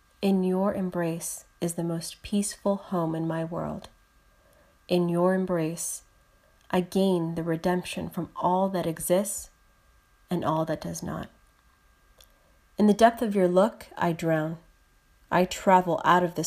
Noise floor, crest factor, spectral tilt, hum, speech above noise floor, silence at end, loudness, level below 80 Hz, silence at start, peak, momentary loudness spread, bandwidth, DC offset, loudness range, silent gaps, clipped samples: -62 dBFS; 22 dB; -5.5 dB/octave; none; 36 dB; 0 s; -27 LUFS; -58 dBFS; 0.2 s; -6 dBFS; 13 LU; 15.5 kHz; under 0.1%; 6 LU; none; under 0.1%